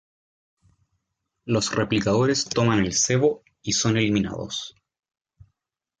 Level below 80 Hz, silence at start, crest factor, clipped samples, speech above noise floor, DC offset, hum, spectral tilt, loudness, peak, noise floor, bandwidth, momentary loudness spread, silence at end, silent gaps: -52 dBFS; 1.45 s; 18 dB; under 0.1%; 59 dB; under 0.1%; none; -4 dB/octave; -23 LUFS; -8 dBFS; -82 dBFS; 9.6 kHz; 11 LU; 1.3 s; none